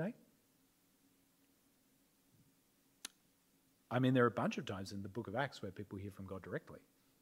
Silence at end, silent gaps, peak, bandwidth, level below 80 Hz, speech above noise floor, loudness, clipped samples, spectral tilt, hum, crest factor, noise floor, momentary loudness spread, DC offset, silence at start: 0.45 s; none; -18 dBFS; 16 kHz; -82 dBFS; 35 dB; -40 LUFS; under 0.1%; -6.5 dB/octave; none; 24 dB; -75 dBFS; 20 LU; under 0.1%; 0 s